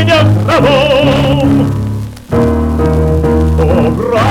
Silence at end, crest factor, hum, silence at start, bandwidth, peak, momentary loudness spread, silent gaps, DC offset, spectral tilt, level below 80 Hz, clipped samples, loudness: 0 s; 8 dB; none; 0 s; 15 kHz; 0 dBFS; 6 LU; none; under 0.1%; -7 dB/octave; -20 dBFS; under 0.1%; -10 LUFS